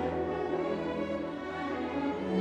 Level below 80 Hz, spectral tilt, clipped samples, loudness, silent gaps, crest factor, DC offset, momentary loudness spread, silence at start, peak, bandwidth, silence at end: -56 dBFS; -7.5 dB/octave; under 0.1%; -34 LUFS; none; 16 dB; under 0.1%; 3 LU; 0 s; -18 dBFS; 9.4 kHz; 0 s